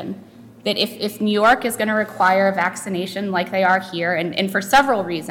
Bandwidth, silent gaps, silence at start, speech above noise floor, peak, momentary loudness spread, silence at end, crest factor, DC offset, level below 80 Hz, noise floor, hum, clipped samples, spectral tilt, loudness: 19 kHz; none; 0 s; 23 dB; -4 dBFS; 9 LU; 0 s; 14 dB; under 0.1%; -54 dBFS; -42 dBFS; none; under 0.1%; -4 dB/octave; -19 LUFS